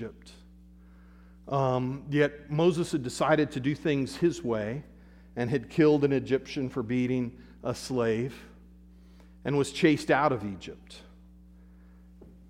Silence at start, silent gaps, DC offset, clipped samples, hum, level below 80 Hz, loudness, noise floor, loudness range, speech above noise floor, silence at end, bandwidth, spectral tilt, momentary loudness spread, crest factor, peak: 0 s; none; under 0.1%; under 0.1%; none; -54 dBFS; -28 LUFS; -53 dBFS; 3 LU; 25 dB; 0.2 s; 14 kHz; -6.5 dB/octave; 14 LU; 20 dB; -8 dBFS